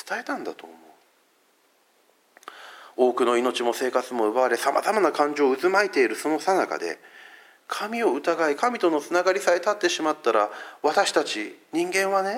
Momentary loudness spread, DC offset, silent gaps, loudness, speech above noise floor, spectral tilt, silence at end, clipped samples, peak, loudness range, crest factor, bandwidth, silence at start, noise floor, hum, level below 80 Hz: 11 LU; under 0.1%; none; -24 LUFS; 40 dB; -3 dB/octave; 0 s; under 0.1%; -6 dBFS; 5 LU; 18 dB; 16.5 kHz; 0.05 s; -64 dBFS; none; -88 dBFS